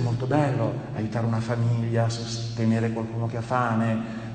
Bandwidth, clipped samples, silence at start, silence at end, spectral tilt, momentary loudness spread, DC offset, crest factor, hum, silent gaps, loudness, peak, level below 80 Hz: 9 kHz; under 0.1%; 0 s; 0 s; -7 dB/octave; 6 LU; under 0.1%; 16 dB; none; none; -26 LUFS; -8 dBFS; -54 dBFS